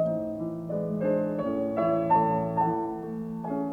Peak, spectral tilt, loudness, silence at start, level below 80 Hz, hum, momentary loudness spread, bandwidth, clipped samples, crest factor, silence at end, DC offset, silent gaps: -12 dBFS; -10 dB/octave; -28 LUFS; 0 s; -60 dBFS; none; 10 LU; 4.9 kHz; under 0.1%; 16 dB; 0 s; under 0.1%; none